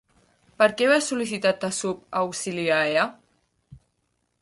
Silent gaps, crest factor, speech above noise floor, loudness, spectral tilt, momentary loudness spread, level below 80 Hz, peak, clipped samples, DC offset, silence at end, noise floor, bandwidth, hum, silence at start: none; 20 dB; 50 dB; -23 LUFS; -3.5 dB/octave; 7 LU; -66 dBFS; -6 dBFS; under 0.1%; under 0.1%; 0.65 s; -73 dBFS; 11.5 kHz; none; 0.6 s